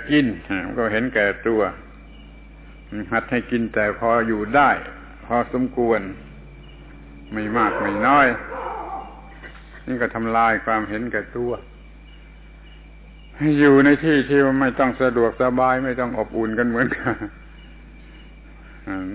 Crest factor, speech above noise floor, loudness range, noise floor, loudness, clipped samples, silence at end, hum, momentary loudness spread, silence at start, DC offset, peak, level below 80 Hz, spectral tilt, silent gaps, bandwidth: 18 dB; 23 dB; 6 LU; -42 dBFS; -20 LUFS; under 0.1%; 0 s; none; 18 LU; 0 s; under 0.1%; -4 dBFS; -42 dBFS; -10 dB/octave; none; 4 kHz